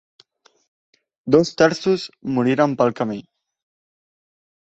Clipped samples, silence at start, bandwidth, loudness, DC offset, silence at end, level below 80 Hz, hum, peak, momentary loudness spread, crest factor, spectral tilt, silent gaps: under 0.1%; 1.25 s; 8.2 kHz; -19 LUFS; under 0.1%; 1.45 s; -60 dBFS; none; 0 dBFS; 10 LU; 22 dB; -6 dB/octave; none